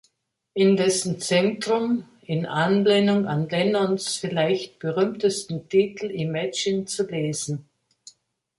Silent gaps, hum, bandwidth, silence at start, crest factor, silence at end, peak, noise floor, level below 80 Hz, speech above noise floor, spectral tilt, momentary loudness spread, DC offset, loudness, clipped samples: none; none; 11.5 kHz; 0.55 s; 16 dB; 0.95 s; -8 dBFS; -72 dBFS; -66 dBFS; 49 dB; -5 dB/octave; 10 LU; under 0.1%; -23 LUFS; under 0.1%